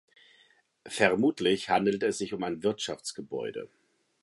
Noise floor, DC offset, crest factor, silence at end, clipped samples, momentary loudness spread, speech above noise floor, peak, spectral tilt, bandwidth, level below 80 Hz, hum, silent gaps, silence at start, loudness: -65 dBFS; under 0.1%; 22 dB; 0.55 s; under 0.1%; 13 LU; 36 dB; -8 dBFS; -4 dB/octave; 11.5 kHz; -68 dBFS; none; none; 0.85 s; -29 LUFS